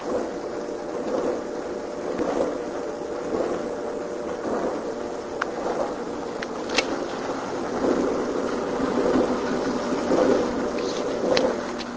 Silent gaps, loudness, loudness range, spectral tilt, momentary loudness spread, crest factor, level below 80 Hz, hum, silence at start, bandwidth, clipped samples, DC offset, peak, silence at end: none; -26 LUFS; 5 LU; -4.5 dB/octave; 9 LU; 24 dB; -52 dBFS; none; 0 s; 8 kHz; under 0.1%; under 0.1%; -2 dBFS; 0 s